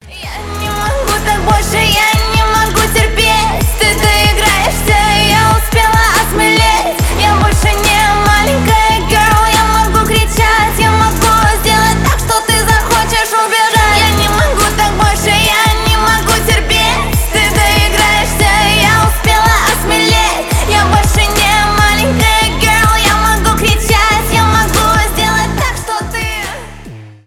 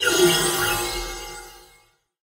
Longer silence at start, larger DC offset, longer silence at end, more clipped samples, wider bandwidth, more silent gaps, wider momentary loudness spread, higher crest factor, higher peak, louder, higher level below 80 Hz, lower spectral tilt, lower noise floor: about the same, 0.05 s vs 0 s; neither; second, 0.15 s vs 0.65 s; neither; first, 18 kHz vs 16 kHz; neither; second, 5 LU vs 19 LU; second, 10 dB vs 18 dB; first, 0 dBFS vs -6 dBFS; first, -10 LUFS vs -20 LUFS; first, -18 dBFS vs -42 dBFS; first, -3.5 dB/octave vs -2 dB/octave; second, -30 dBFS vs -59 dBFS